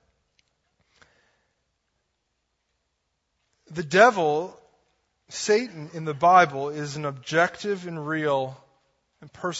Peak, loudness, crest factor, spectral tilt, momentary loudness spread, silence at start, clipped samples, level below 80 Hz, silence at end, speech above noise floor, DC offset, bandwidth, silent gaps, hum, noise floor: -2 dBFS; -23 LUFS; 24 dB; -4.5 dB/octave; 18 LU; 3.7 s; under 0.1%; -70 dBFS; 0 s; 53 dB; under 0.1%; 8 kHz; none; none; -77 dBFS